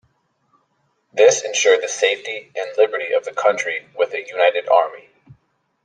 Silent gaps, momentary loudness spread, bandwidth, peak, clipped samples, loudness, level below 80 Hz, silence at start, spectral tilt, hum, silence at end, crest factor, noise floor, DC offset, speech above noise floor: none; 11 LU; 9.6 kHz; -2 dBFS; under 0.1%; -18 LUFS; -72 dBFS; 1.15 s; 0 dB/octave; none; 0.85 s; 18 dB; -67 dBFS; under 0.1%; 49 dB